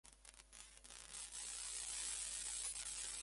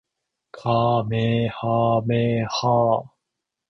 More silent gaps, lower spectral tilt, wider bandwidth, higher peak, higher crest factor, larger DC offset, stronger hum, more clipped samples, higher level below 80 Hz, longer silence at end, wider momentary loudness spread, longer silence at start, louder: neither; second, 1.5 dB/octave vs -7 dB/octave; first, 12 kHz vs 6.2 kHz; second, -28 dBFS vs -6 dBFS; about the same, 20 dB vs 16 dB; neither; neither; neither; second, -68 dBFS vs -54 dBFS; second, 0 s vs 0.65 s; first, 16 LU vs 4 LU; second, 0.05 s vs 0.55 s; second, -45 LUFS vs -22 LUFS